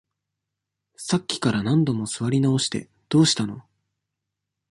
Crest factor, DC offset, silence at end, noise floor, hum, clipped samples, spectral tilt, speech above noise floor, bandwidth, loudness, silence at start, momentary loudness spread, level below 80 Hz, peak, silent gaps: 18 dB; under 0.1%; 1.1 s; -83 dBFS; none; under 0.1%; -5 dB/octave; 61 dB; 11.5 kHz; -23 LUFS; 1 s; 13 LU; -60 dBFS; -6 dBFS; none